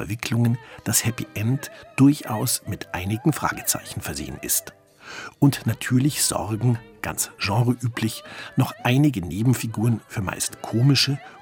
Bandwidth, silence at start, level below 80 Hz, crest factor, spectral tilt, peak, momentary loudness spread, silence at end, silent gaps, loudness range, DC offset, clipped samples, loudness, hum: 17.5 kHz; 0 s; -54 dBFS; 18 dB; -4.5 dB/octave; -4 dBFS; 11 LU; 0 s; none; 2 LU; under 0.1%; under 0.1%; -23 LUFS; none